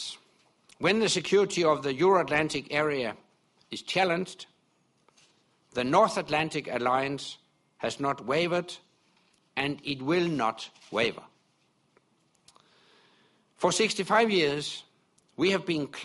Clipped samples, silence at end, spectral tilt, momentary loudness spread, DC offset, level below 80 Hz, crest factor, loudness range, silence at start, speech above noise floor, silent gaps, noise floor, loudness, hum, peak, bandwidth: under 0.1%; 0 s; -4 dB/octave; 17 LU; under 0.1%; -68 dBFS; 20 dB; 6 LU; 0 s; 42 dB; none; -70 dBFS; -27 LUFS; none; -8 dBFS; 11.5 kHz